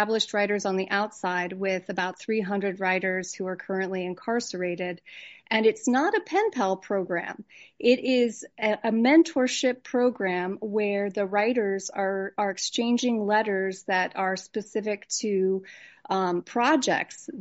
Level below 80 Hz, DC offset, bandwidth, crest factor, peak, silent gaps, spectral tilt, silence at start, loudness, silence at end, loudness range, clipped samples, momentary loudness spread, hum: -76 dBFS; under 0.1%; 8 kHz; 18 dB; -8 dBFS; none; -3 dB/octave; 0 s; -26 LUFS; 0 s; 4 LU; under 0.1%; 8 LU; none